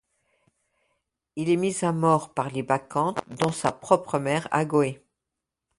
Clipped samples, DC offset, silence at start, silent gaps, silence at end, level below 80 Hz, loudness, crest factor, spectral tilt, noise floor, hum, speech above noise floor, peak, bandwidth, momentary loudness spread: under 0.1%; under 0.1%; 1.35 s; none; 0.85 s; -64 dBFS; -25 LUFS; 22 dB; -6 dB/octave; -85 dBFS; none; 61 dB; -4 dBFS; 11.5 kHz; 7 LU